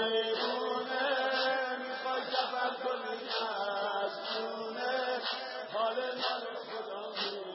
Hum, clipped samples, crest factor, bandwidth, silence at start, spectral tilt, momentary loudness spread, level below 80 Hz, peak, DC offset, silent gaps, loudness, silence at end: none; under 0.1%; 16 dB; 5.8 kHz; 0 s; 1.5 dB/octave; 7 LU; under -90 dBFS; -18 dBFS; under 0.1%; none; -34 LUFS; 0 s